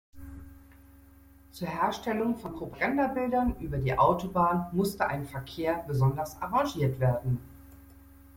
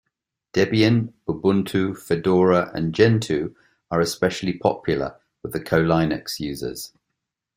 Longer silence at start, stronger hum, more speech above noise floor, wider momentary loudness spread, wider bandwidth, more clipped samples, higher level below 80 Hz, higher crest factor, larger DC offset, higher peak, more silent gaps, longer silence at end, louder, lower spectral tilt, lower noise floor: second, 0.15 s vs 0.55 s; neither; second, 27 dB vs 60 dB; about the same, 13 LU vs 13 LU; about the same, 16.5 kHz vs 16 kHz; neither; about the same, -48 dBFS vs -52 dBFS; about the same, 18 dB vs 20 dB; neither; second, -12 dBFS vs -2 dBFS; neither; second, 0.1 s vs 0.7 s; second, -29 LUFS vs -22 LUFS; about the same, -7 dB/octave vs -6 dB/octave; second, -55 dBFS vs -81 dBFS